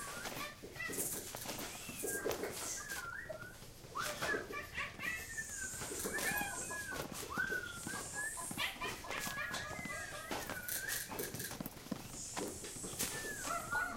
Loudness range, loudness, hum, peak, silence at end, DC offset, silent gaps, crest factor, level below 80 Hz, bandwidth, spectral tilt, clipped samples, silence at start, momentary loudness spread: 2 LU; -41 LUFS; none; -20 dBFS; 0 s; under 0.1%; none; 22 dB; -60 dBFS; 17 kHz; -2 dB/octave; under 0.1%; 0 s; 6 LU